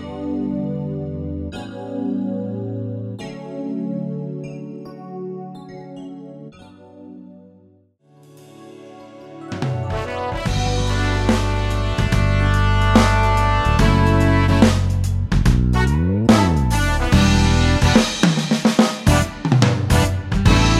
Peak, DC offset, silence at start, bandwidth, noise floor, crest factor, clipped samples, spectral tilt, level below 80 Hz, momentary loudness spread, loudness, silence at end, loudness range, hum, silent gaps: 0 dBFS; under 0.1%; 0 s; 14.5 kHz; -54 dBFS; 18 dB; under 0.1%; -6 dB/octave; -26 dBFS; 18 LU; -18 LUFS; 0 s; 18 LU; none; none